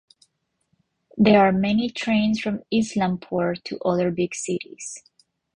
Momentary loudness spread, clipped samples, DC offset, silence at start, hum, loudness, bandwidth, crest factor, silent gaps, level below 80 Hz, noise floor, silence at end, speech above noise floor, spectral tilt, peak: 17 LU; under 0.1%; under 0.1%; 1.15 s; none; -22 LUFS; 11 kHz; 20 dB; none; -56 dBFS; -71 dBFS; 0.6 s; 50 dB; -5.5 dB/octave; -4 dBFS